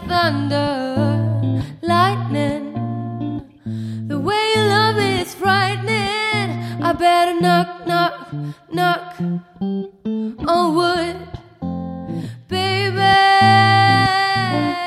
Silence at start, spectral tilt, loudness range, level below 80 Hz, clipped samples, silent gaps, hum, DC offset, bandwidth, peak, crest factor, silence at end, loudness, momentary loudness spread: 0 s; -5.5 dB/octave; 6 LU; -48 dBFS; under 0.1%; none; none; under 0.1%; 15 kHz; -2 dBFS; 16 dB; 0 s; -18 LUFS; 15 LU